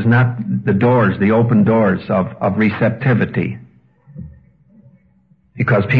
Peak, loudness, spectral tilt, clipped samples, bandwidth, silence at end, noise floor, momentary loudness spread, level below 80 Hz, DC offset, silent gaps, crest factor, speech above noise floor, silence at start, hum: -2 dBFS; -15 LUFS; -10.5 dB/octave; under 0.1%; 4.9 kHz; 0 s; -54 dBFS; 12 LU; -50 dBFS; under 0.1%; none; 14 dB; 40 dB; 0 s; none